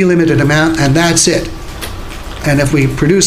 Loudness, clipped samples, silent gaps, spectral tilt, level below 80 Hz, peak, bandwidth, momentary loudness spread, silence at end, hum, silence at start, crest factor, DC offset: -11 LUFS; under 0.1%; none; -4.5 dB/octave; -28 dBFS; 0 dBFS; 16 kHz; 15 LU; 0 s; none; 0 s; 12 dB; under 0.1%